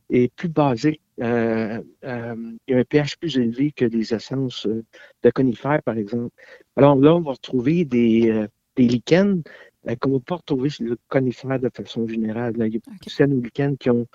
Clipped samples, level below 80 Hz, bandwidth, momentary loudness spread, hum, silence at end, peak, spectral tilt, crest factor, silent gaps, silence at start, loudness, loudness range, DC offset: under 0.1%; -56 dBFS; 7.6 kHz; 12 LU; none; 0.1 s; -2 dBFS; -7.5 dB/octave; 20 dB; none; 0.1 s; -21 LUFS; 5 LU; under 0.1%